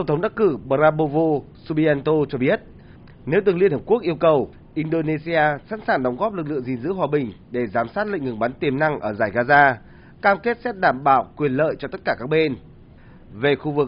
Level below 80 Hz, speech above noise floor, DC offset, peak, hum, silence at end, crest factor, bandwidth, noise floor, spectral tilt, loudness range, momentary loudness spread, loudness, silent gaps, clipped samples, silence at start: -50 dBFS; 25 dB; under 0.1%; -2 dBFS; none; 0 s; 18 dB; 5.4 kHz; -45 dBFS; -5 dB/octave; 4 LU; 8 LU; -21 LUFS; none; under 0.1%; 0 s